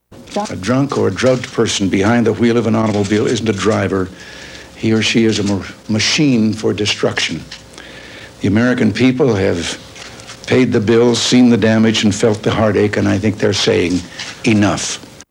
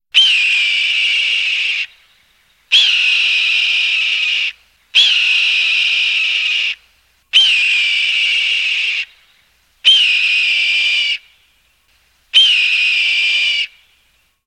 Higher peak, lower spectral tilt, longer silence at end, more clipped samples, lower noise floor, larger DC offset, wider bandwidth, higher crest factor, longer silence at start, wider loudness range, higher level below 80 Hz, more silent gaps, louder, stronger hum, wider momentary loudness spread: about the same, 0 dBFS vs -2 dBFS; first, -5 dB/octave vs 4.5 dB/octave; second, 0.05 s vs 0.8 s; neither; second, -35 dBFS vs -58 dBFS; neither; second, 12 kHz vs 15.5 kHz; about the same, 14 dB vs 14 dB; about the same, 0.1 s vs 0.15 s; about the same, 4 LU vs 2 LU; first, -46 dBFS vs -62 dBFS; neither; second, -14 LUFS vs -11 LUFS; neither; first, 16 LU vs 9 LU